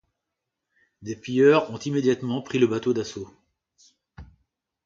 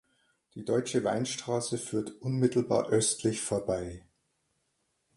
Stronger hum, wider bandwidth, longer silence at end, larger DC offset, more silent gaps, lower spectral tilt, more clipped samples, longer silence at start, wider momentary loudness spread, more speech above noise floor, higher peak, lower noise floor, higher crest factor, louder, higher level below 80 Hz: neither; second, 7.6 kHz vs 11.5 kHz; second, 0.6 s vs 1.15 s; neither; neither; about the same, -6 dB/octave vs -5 dB/octave; neither; first, 1 s vs 0.55 s; first, 20 LU vs 11 LU; first, 61 dB vs 47 dB; first, -6 dBFS vs -12 dBFS; first, -83 dBFS vs -77 dBFS; about the same, 20 dB vs 18 dB; first, -23 LUFS vs -30 LUFS; about the same, -60 dBFS vs -60 dBFS